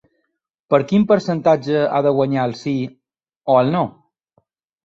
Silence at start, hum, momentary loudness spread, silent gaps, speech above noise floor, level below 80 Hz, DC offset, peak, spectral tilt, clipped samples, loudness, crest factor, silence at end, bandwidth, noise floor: 0.7 s; none; 9 LU; 3.37-3.41 s; 57 dB; -60 dBFS; under 0.1%; -2 dBFS; -7.5 dB/octave; under 0.1%; -18 LUFS; 18 dB; 0.95 s; 7.6 kHz; -74 dBFS